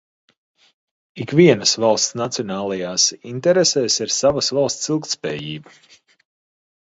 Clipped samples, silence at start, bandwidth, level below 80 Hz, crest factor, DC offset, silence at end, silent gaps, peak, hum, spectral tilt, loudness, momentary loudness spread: under 0.1%; 1.15 s; 8 kHz; -60 dBFS; 20 dB; under 0.1%; 1.3 s; none; 0 dBFS; none; -3.5 dB/octave; -18 LUFS; 11 LU